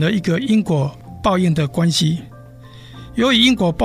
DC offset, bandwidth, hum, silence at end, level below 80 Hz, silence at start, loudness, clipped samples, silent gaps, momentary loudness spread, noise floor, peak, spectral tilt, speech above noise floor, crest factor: under 0.1%; 15 kHz; none; 0 s; -42 dBFS; 0 s; -17 LUFS; under 0.1%; none; 13 LU; -39 dBFS; -2 dBFS; -5.5 dB/octave; 23 dB; 16 dB